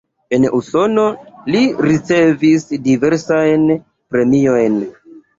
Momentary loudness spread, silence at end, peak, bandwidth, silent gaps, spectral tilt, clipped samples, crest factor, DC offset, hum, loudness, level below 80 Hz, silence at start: 7 LU; 0.2 s; -2 dBFS; 7.8 kHz; none; -6.5 dB/octave; under 0.1%; 12 dB; under 0.1%; none; -14 LUFS; -52 dBFS; 0.3 s